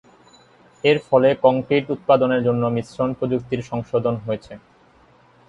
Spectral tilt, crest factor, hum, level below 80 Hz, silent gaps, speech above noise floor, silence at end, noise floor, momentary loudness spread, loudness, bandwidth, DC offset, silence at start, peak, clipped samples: -7.5 dB/octave; 18 dB; none; -56 dBFS; none; 34 dB; 0.9 s; -53 dBFS; 10 LU; -20 LUFS; 8.8 kHz; under 0.1%; 0.85 s; -2 dBFS; under 0.1%